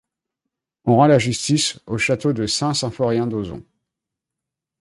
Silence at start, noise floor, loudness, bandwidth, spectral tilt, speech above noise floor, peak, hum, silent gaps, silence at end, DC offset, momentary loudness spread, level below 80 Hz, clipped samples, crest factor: 0.85 s; -84 dBFS; -19 LUFS; 11.5 kHz; -5 dB/octave; 66 dB; -2 dBFS; none; none; 1.2 s; under 0.1%; 13 LU; -52 dBFS; under 0.1%; 18 dB